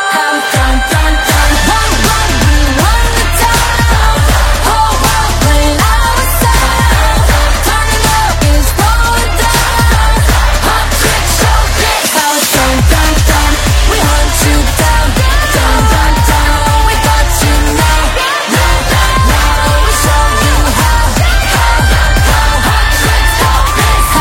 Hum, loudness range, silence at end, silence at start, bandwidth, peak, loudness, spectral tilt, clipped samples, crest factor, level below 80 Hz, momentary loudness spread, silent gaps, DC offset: none; 0 LU; 0 s; 0 s; 17 kHz; 0 dBFS; -9 LUFS; -3.5 dB/octave; 0.4%; 8 dB; -12 dBFS; 1 LU; none; under 0.1%